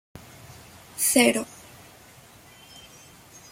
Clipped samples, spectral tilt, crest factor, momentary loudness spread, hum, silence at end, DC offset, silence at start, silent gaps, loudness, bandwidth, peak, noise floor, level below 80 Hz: under 0.1%; -2 dB/octave; 24 dB; 28 LU; none; 2.05 s; under 0.1%; 0.15 s; none; -21 LUFS; 16.5 kHz; -4 dBFS; -51 dBFS; -64 dBFS